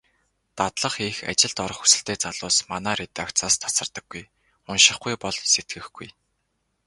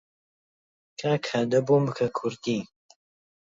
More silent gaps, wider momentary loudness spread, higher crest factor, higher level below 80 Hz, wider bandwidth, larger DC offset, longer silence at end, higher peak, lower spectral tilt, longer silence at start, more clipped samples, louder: neither; first, 19 LU vs 10 LU; first, 24 dB vs 18 dB; first, -56 dBFS vs -68 dBFS; first, 12 kHz vs 7.8 kHz; neither; about the same, 0.75 s vs 0.85 s; first, 0 dBFS vs -10 dBFS; second, -0.5 dB/octave vs -6.5 dB/octave; second, 0.55 s vs 1 s; neither; first, -21 LUFS vs -26 LUFS